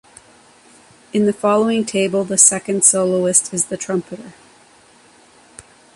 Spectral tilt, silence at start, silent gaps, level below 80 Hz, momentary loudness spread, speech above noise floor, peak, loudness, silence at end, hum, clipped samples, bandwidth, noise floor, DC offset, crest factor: -3.5 dB/octave; 1.15 s; none; -62 dBFS; 12 LU; 32 dB; 0 dBFS; -15 LUFS; 1.65 s; none; under 0.1%; 12 kHz; -49 dBFS; under 0.1%; 20 dB